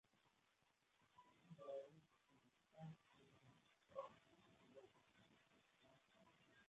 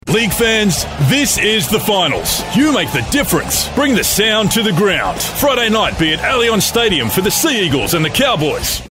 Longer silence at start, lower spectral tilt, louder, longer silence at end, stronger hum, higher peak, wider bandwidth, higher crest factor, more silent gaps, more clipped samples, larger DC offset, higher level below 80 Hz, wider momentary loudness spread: about the same, 0.05 s vs 0.05 s; first, -5.5 dB/octave vs -3.5 dB/octave; second, -61 LUFS vs -13 LUFS; about the same, 0 s vs 0 s; neither; second, -40 dBFS vs -2 dBFS; second, 8 kHz vs 16.5 kHz; first, 24 dB vs 12 dB; neither; neither; neither; second, under -90 dBFS vs -34 dBFS; first, 12 LU vs 4 LU